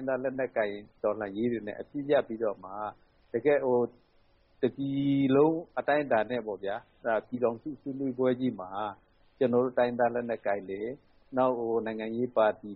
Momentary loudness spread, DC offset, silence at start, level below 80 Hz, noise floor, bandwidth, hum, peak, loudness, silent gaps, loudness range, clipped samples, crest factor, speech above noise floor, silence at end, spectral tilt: 11 LU; under 0.1%; 0 s; -66 dBFS; -64 dBFS; 4.3 kHz; none; -14 dBFS; -30 LUFS; none; 3 LU; under 0.1%; 16 dB; 35 dB; 0 s; -5.5 dB/octave